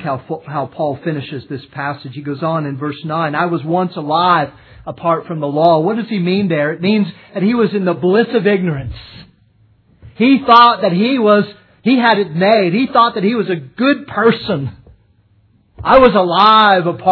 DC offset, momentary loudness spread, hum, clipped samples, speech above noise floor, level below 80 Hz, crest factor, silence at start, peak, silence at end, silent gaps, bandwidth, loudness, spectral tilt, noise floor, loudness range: under 0.1%; 15 LU; none; under 0.1%; 40 dB; -46 dBFS; 14 dB; 0 s; 0 dBFS; 0 s; none; 5.4 kHz; -14 LUFS; -8.5 dB/octave; -53 dBFS; 6 LU